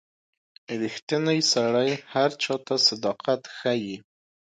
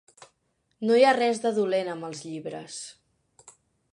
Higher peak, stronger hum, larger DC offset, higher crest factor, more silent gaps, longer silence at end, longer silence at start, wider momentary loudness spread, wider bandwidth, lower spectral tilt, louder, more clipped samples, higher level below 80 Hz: about the same, -8 dBFS vs -6 dBFS; neither; neither; about the same, 18 dB vs 22 dB; first, 1.02-1.07 s vs none; first, 0.6 s vs 0.4 s; about the same, 0.7 s vs 0.8 s; second, 10 LU vs 18 LU; about the same, 11 kHz vs 11 kHz; about the same, -3.5 dB/octave vs -4 dB/octave; about the same, -24 LUFS vs -25 LUFS; neither; about the same, -74 dBFS vs -78 dBFS